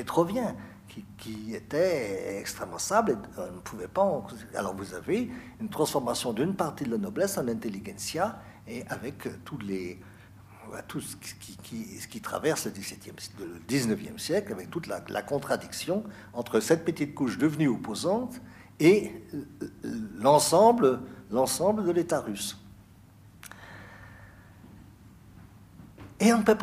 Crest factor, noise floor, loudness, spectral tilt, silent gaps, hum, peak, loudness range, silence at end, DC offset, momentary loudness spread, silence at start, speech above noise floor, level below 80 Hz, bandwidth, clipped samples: 22 dB; -54 dBFS; -29 LUFS; -5 dB/octave; none; none; -8 dBFS; 13 LU; 0 s; under 0.1%; 19 LU; 0 s; 25 dB; -60 dBFS; 15.5 kHz; under 0.1%